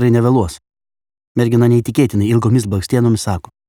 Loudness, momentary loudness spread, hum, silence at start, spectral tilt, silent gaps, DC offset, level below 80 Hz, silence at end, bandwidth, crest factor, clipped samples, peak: -15 LUFS; 7 LU; none; 0 s; -7 dB/octave; 1.27-1.35 s; under 0.1%; -42 dBFS; 0.3 s; 15 kHz; 14 dB; under 0.1%; 0 dBFS